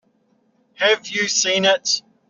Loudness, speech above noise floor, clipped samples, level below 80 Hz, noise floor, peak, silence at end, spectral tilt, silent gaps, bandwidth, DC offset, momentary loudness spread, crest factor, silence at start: -18 LUFS; 44 dB; under 0.1%; -72 dBFS; -62 dBFS; -4 dBFS; 0.3 s; 0 dB/octave; none; 7.6 kHz; under 0.1%; 4 LU; 18 dB; 0.8 s